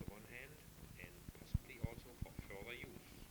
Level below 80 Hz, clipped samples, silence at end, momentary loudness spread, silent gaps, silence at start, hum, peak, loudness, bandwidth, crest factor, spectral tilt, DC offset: -56 dBFS; under 0.1%; 0 s; 10 LU; none; 0 s; none; -26 dBFS; -52 LUFS; over 20 kHz; 26 dB; -5.5 dB/octave; under 0.1%